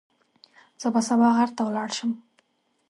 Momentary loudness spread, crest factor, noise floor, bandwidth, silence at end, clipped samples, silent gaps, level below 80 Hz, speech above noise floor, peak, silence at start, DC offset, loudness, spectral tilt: 11 LU; 18 dB; -69 dBFS; 11.5 kHz; 0.7 s; under 0.1%; none; -76 dBFS; 46 dB; -8 dBFS; 0.8 s; under 0.1%; -24 LUFS; -4.5 dB/octave